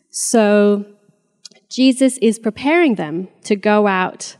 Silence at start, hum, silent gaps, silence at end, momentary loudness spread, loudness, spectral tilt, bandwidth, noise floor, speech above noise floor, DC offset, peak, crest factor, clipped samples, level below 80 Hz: 0.15 s; none; none; 0.1 s; 9 LU; -16 LUFS; -4.5 dB/octave; 14.5 kHz; -58 dBFS; 43 dB; under 0.1%; -2 dBFS; 16 dB; under 0.1%; -66 dBFS